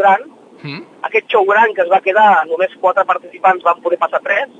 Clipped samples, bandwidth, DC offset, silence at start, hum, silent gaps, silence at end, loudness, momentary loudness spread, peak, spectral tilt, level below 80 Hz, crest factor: under 0.1%; 7.8 kHz; under 0.1%; 0 s; none; none; 0.15 s; -13 LUFS; 15 LU; 0 dBFS; -5.5 dB/octave; -78 dBFS; 14 dB